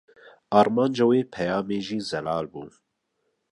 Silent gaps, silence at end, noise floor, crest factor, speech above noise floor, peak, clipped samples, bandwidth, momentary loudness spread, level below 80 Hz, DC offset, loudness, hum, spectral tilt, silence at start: none; 0.85 s; -76 dBFS; 22 dB; 52 dB; -4 dBFS; under 0.1%; 11 kHz; 10 LU; -62 dBFS; under 0.1%; -24 LUFS; none; -6.5 dB/octave; 0.25 s